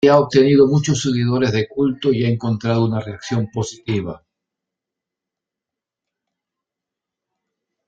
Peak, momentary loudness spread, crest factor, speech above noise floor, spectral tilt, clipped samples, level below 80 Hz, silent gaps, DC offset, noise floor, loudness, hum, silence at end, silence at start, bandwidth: -2 dBFS; 11 LU; 18 dB; 69 dB; -6.5 dB/octave; under 0.1%; -54 dBFS; none; under 0.1%; -86 dBFS; -18 LUFS; none; 3.7 s; 0 s; 9 kHz